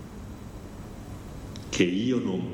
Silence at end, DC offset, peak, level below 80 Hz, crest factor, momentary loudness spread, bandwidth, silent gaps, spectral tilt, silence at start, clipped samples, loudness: 0 s; under 0.1%; -8 dBFS; -46 dBFS; 22 dB; 17 LU; 16.5 kHz; none; -5.5 dB/octave; 0 s; under 0.1%; -27 LUFS